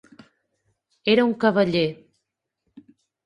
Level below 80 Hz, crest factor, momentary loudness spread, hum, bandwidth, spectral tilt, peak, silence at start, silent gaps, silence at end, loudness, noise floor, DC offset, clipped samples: -64 dBFS; 20 dB; 8 LU; none; 10 kHz; -7 dB/octave; -4 dBFS; 1.05 s; none; 1.3 s; -21 LUFS; -79 dBFS; under 0.1%; under 0.1%